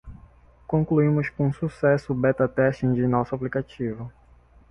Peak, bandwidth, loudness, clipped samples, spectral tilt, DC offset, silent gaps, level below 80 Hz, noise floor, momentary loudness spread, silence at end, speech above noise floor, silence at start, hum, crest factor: -8 dBFS; 8 kHz; -24 LUFS; under 0.1%; -9.5 dB/octave; under 0.1%; none; -50 dBFS; -54 dBFS; 10 LU; 0.6 s; 31 dB; 0.05 s; none; 16 dB